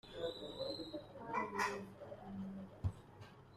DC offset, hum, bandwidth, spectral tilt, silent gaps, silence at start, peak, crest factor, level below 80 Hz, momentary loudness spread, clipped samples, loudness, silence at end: under 0.1%; none; 14.5 kHz; -5 dB/octave; none; 0.05 s; -26 dBFS; 20 dB; -62 dBFS; 13 LU; under 0.1%; -45 LUFS; 0 s